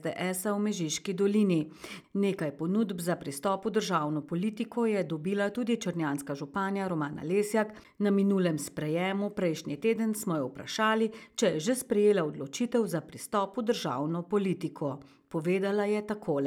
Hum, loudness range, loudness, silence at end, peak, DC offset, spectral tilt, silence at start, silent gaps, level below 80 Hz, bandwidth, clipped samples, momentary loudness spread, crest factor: none; 2 LU; -30 LUFS; 0 s; -14 dBFS; under 0.1%; -5.5 dB/octave; 0 s; none; -70 dBFS; 17 kHz; under 0.1%; 7 LU; 16 dB